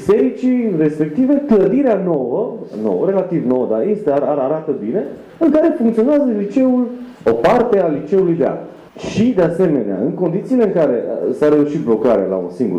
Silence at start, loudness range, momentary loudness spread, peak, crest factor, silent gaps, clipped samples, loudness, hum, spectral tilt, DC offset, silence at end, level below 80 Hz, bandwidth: 0 s; 2 LU; 7 LU; -4 dBFS; 12 dB; none; under 0.1%; -16 LUFS; none; -8.5 dB/octave; under 0.1%; 0 s; -52 dBFS; 9.4 kHz